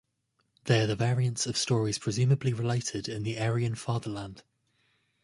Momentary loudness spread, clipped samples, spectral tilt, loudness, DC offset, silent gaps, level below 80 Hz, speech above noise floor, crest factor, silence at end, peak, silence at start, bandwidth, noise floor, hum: 8 LU; under 0.1%; -5 dB/octave; -29 LUFS; under 0.1%; none; -60 dBFS; 48 dB; 20 dB; 0.85 s; -10 dBFS; 0.65 s; 11.5 kHz; -76 dBFS; none